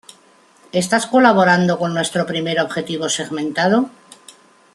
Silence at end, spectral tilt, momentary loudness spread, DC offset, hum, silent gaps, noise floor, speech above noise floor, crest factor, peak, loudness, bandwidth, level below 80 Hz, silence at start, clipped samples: 0.85 s; -4.5 dB/octave; 10 LU; under 0.1%; none; none; -51 dBFS; 35 dB; 18 dB; -2 dBFS; -17 LUFS; 12.5 kHz; -62 dBFS; 0.75 s; under 0.1%